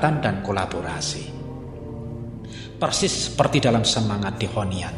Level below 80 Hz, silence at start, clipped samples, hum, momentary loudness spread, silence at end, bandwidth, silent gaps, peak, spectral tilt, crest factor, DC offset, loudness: -44 dBFS; 0 s; under 0.1%; none; 16 LU; 0 s; 12 kHz; none; -2 dBFS; -4.5 dB/octave; 22 dB; under 0.1%; -23 LUFS